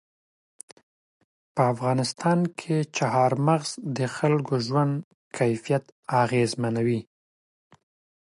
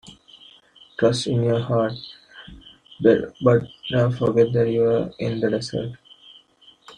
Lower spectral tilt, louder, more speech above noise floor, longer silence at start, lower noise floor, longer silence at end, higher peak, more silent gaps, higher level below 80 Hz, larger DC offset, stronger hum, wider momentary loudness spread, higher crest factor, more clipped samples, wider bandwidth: about the same, -6 dB/octave vs -7 dB/octave; second, -25 LUFS vs -21 LUFS; first, over 66 dB vs 34 dB; first, 1.55 s vs 0.1 s; first, under -90 dBFS vs -54 dBFS; first, 1.25 s vs 0.05 s; second, -8 dBFS vs -4 dBFS; first, 5.04-5.31 s, 5.92-6.03 s vs none; second, -68 dBFS vs -56 dBFS; neither; neither; second, 7 LU vs 18 LU; about the same, 18 dB vs 18 dB; neither; first, 11.5 kHz vs 10 kHz